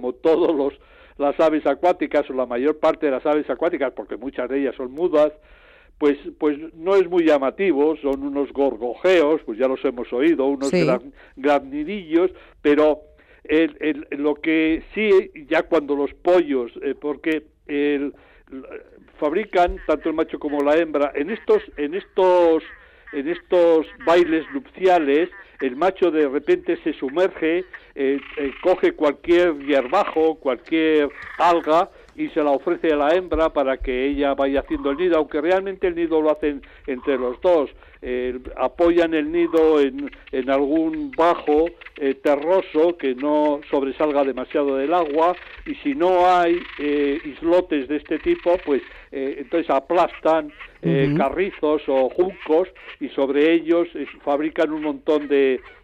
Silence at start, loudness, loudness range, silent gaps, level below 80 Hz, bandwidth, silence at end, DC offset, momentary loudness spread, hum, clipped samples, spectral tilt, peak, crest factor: 0 s; -21 LUFS; 3 LU; none; -48 dBFS; 8.6 kHz; 0.15 s; under 0.1%; 9 LU; none; under 0.1%; -6.5 dB/octave; -6 dBFS; 14 dB